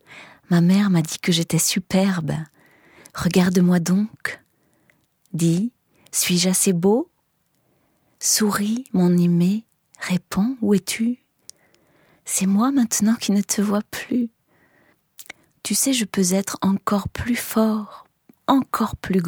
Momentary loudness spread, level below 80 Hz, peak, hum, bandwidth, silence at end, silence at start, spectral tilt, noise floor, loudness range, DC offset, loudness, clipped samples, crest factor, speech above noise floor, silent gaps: 13 LU; -54 dBFS; -2 dBFS; none; 19 kHz; 0 s; 0.1 s; -4.5 dB/octave; -68 dBFS; 3 LU; under 0.1%; -20 LUFS; under 0.1%; 20 dB; 48 dB; none